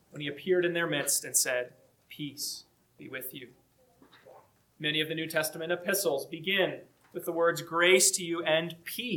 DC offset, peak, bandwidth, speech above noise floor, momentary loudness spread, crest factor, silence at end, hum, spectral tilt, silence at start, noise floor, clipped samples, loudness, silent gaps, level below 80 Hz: under 0.1%; -10 dBFS; 19 kHz; 33 dB; 17 LU; 22 dB; 0 s; none; -2 dB/octave; 0.15 s; -63 dBFS; under 0.1%; -29 LUFS; none; -78 dBFS